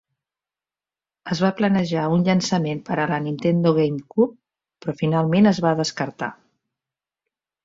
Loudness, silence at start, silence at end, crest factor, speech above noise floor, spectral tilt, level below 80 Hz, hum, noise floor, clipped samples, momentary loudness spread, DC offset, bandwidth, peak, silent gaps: -21 LUFS; 1.25 s; 1.3 s; 18 dB; over 70 dB; -6.5 dB/octave; -60 dBFS; none; under -90 dBFS; under 0.1%; 11 LU; under 0.1%; 7.8 kHz; -4 dBFS; none